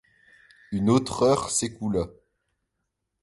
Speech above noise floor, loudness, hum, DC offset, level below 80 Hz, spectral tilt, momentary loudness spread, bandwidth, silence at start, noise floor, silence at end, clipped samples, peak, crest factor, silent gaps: 56 dB; -25 LUFS; none; under 0.1%; -52 dBFS; -5 dB/octave; 10 LU; 11.5 kHz; 0.7 s; -80 dBFS; 1.1 s; under 0.1%; -8 dBFS; 18 dB; none